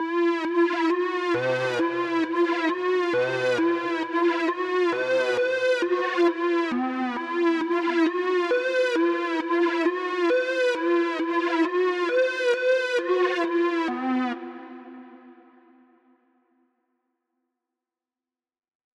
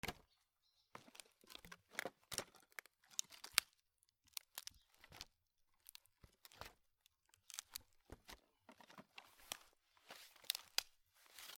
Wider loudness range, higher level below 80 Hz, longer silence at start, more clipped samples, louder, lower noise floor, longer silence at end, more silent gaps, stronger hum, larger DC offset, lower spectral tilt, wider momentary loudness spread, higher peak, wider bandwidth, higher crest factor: second, 4 LU vs 12 LU; about the same, -78 dBFS vs -76 dBFS; about the same, 0 s vs 0.05 s; neither; first, -24 LUFS vs -48 LUFS; first, under -90 dBFS vs -83 dBFS; first, 3.6 s vs 0 s; neither; neither; neither; first, -5 dB/octave vs 0 dB/octave; second, 4 LU vs 22 LU; about the same, -10 dBFS vs -10 dBFS; second, 9.2 kHz vs over 20 kHz; second, 14 dB vs 42 dB